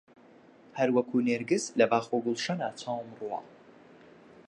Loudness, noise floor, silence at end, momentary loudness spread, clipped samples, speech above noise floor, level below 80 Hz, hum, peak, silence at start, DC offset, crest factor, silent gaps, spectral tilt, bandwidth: -30 LUFS; -56 dBFS; 1 s; 12 LU; under 0.1%; 27 dB; -80 dBFS; none; -10 dBFS; 0.75 s; under 0.1%; 22 dB; none; -5 dB/octave; 11 kHz